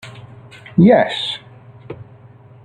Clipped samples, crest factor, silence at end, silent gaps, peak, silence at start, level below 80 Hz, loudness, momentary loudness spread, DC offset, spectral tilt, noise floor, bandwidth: under 0.1%; 16 dB; 0.6 s; none; -2 dBFS; 0.05 s; -54 dBFS; -15 LUFS; 25 LU; under 0.1%; -7.5 dB/octave; -43 dBFS; 9.6 kHz